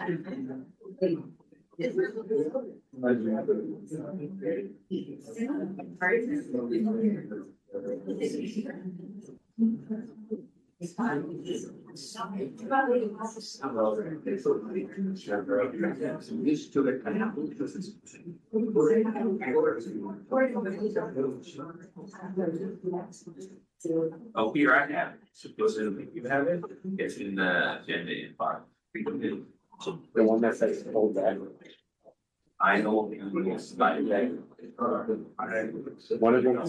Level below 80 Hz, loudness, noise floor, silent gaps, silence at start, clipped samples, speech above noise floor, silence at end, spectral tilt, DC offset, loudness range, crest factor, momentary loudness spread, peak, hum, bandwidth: -76 dBFS; -30 LUFS; -69 dBFS; none; 0 s; under 0.1%; 39 dB; 0 s; -6.5 dB/octave; under 0.1%; 6 LU; 20 dB; 16 LU; -12 dBFS; none; 10 kHz